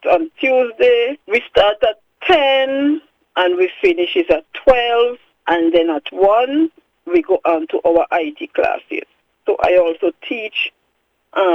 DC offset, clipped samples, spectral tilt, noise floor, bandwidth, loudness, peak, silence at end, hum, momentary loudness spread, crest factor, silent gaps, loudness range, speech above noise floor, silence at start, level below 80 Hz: under 0.1%; under 0.1%; -5 dB/octave; -66 dBFS; 6.6 kHz; -16 LUFS; 0 dBFS; 0 s; none; 9 LU; 16 dB; none; 3 LU; 50 dB; 0 s; -46 dBFS